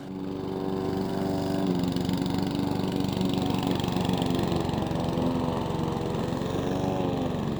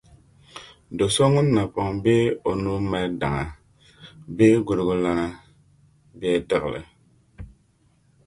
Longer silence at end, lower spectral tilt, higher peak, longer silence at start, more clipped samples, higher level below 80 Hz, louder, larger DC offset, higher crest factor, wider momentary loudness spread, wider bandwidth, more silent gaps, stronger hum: second, 0 s vs 0.8 s; about the same, -7 dB/octave vs -6 dB/octave; second, -12 dBFS vs -4 dBFS; second, 0 s vs 0.55 s; neither; about the same, -48 dBFS vs -46 dBFS; second, -28 LUFS vs -22 LUFS; neither; about the same, 16 dB vs 20 dB; second, 3 LU vs 19 LU; first, over 20 kHz vs 11.5 kHz; neither; neither